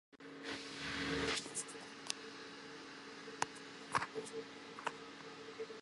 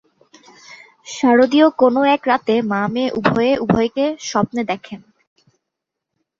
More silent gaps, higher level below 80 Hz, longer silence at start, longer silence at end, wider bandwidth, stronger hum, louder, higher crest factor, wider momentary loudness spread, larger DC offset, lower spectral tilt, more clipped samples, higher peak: neither; second, -68 dBFS vs -54 dBFS; second, 0.1 s vs 0.7 s; second, 0 s vs 1.4 s; first, 11.5 kHz vs 7.6 kHz; neither; second, -44 LUFS vs -17 LUFS; first, 32 dB vs 16 dB; about the same, 13 LU vs 13 LU; neither; second, -2.5 dB/octave vs -5.5 dB/octave; neither; second, -14 dBFS vs -2 dBFS